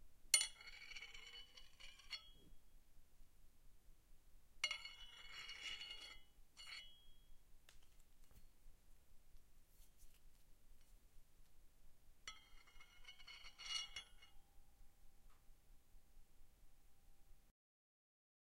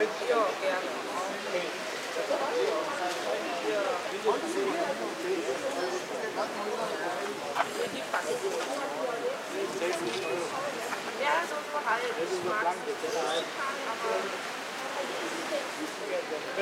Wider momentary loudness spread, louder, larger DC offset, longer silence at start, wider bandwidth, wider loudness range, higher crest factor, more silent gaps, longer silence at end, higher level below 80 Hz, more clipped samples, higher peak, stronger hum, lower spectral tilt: first, 23 LU vs 5 LU; second, -47 LUFS vs -32 LUFS; neither; about the same, 0 s vs 0 s; about the same, 16 kHz vs 16 kHz; first, 13 LU vs 2 LU; first, 38 dB vs 20 dB; neither; first, 1 s vs 0 s; first, -68 dBFS vs -82 dBFS; neither; second, -16 dBFS vs -12 dBFS; neither; second, 2 dB/octave vs -2.5 dB/octave